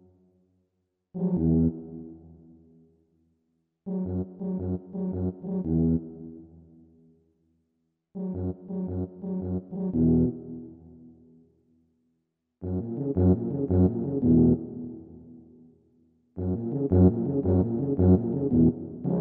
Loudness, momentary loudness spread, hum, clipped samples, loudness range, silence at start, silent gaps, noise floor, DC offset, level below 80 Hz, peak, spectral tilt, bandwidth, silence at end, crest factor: -26 LUFS; 20 LU; none; under 0.1%; 9 LU; 1.15 s; none; -78 dBFS; under 0.1%; -46 dBFS; -8 dBFS; -15 dB/octave; 1.8 kHz; 0 s; 20 dB